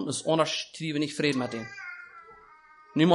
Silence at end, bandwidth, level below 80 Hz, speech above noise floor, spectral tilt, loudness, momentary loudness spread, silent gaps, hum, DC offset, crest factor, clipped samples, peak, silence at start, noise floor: 0 s; 11.5 kHz; -70 dBFS; 26 dB; -5 dB/octave; -29 LUFS; 18 LU; none; none; under 0.1%; 20 dB; under 0.1%; -8 dBFS; 0 s; -54 dBFS